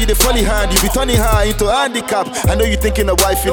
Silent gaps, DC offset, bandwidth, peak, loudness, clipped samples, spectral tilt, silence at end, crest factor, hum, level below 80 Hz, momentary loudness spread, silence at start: none; under 0.1%; 19.5 kHz; 0 dBFS; -14 LUFS; under 0.1%; -3.5 dB/octave; 0 s; 14 dB; none; -18 dBFS; 4 LU; 0 s